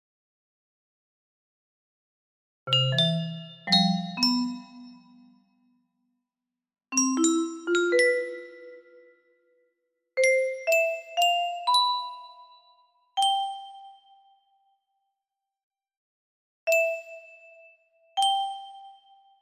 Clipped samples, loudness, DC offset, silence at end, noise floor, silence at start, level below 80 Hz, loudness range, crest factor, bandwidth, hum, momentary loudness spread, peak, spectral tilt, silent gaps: under 0.1%; -25 LUFS; under 0.1%; 0.5 s; -88 dBFS; 2.65 s; -80 dBFS; 7 LU; 20 dB; 15.5 kHz; none; 19 LU; -10 dBFS; -3.5 dB/octave; 15.63-15.71 s, 15.97-16.67 s